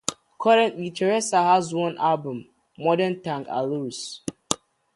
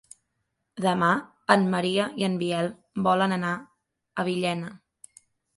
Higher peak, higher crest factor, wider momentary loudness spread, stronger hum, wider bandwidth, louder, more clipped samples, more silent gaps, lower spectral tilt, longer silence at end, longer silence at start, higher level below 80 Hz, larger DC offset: about the same, -2 dBFS vs -2 dBFS; about the same, 22 dB vs 26 dB; about the same, 13 LU vs 12 LU; neither; about the same, 11.5 kHz vs 11.5 kHz; about the same, -24 LUFS vs -26 LUFS; neither; neither; second, -4 dB/octave vs -5.5 dB/octave; second, 0.4 s vs 0.8 s; second, 0.1 s vs 0.75 s; about the same, -66 dBFS vs -68 dBFS; neither